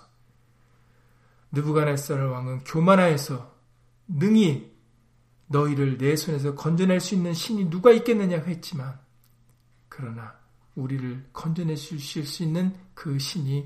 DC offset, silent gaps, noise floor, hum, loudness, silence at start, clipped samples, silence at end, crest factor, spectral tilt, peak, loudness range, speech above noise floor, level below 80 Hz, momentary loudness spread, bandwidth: under 0.1%; none; -61 dBFS; none; -24 LUFS; 1.5 s; under 0.1%; 0 s; 22 dB; -6.5 dB/octave; -4 dBFS; 10 LU; 37 dB; -62 dBFS; 16 LU; 15.5 kHz